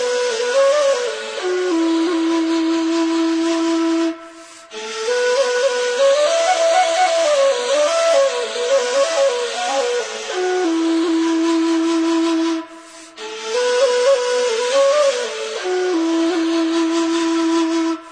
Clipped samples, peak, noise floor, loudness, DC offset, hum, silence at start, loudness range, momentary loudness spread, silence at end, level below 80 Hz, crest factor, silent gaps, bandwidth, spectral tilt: under 0.1%; -4 dBFS; -39 dBFS; -17 LUFS; under 0.1%; none; 0 s; 3 LU; 9 LU; 0 s; -66 dBFS; 12 dB; none; 10.5 kHz; -1 dB/octave